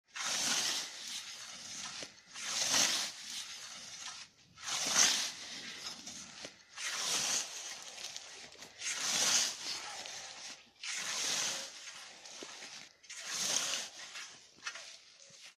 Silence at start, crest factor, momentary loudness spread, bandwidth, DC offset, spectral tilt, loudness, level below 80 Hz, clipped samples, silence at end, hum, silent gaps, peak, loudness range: 0.15 s; 26 dB; 20 LU; 15.5 kHz; under 0.1%; 1.5 dB/octave; -35 LUFS; -82 dBFS; under 0.1%; 0.05 s; none; none; -14 dBFS; 6 LU